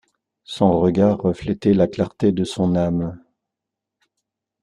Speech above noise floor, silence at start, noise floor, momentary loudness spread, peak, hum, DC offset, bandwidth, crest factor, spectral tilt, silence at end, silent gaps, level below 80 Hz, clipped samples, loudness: 66 dB; 0.5 s; -84 dBFS; 6 LU; -2 dBFS; none; under 0.1%; 11 kHz; 18 dB; -8 dB/octave; 1.45 s; none; -50 dBFS; under 0.1%; -19 LUFS